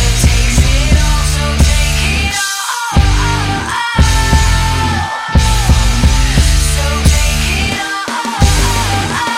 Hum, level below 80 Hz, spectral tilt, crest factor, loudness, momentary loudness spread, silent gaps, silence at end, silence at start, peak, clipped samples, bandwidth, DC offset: none; -14 dBFS; -4 dB/octave; 12 dB; -12 LUFS; 4 LU; none; 0 s; 0 s; 0 dBFS; under 0.1%; 16.5 kHz; under 0.1%